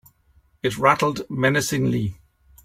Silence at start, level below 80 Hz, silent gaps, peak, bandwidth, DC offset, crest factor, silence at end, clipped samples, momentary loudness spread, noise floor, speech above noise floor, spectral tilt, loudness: 0.65 s; -52 dBFS; none; -2 dBFS; 16.5 kHz; under 0.1%; 22 dB; 0.5 s; under 0.1%; 9 LU; -59 dBFS; 39 dB; -5 dB/octave; -22 LUFS